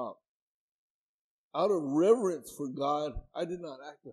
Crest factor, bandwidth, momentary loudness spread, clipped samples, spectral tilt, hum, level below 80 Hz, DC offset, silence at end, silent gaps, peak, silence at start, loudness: 20 dB; 13.5 kHz; 16 LU; under 0.1%; -6 dB/octave; none; -56 dBFS; under 0.1%; 0 s; 0.28-1.51 s; -12 dBFS; 0 s; -31 LUFS